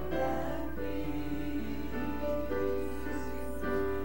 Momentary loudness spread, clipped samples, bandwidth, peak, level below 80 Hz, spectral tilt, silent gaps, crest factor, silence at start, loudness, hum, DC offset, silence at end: 5 LU; under 0.1%; 16.5 kHz; -20 dBFS; -44 dBFS; -7 dB/octave; none; 14 dB; 0 s; -36 LUFS; none; 1%; 0 s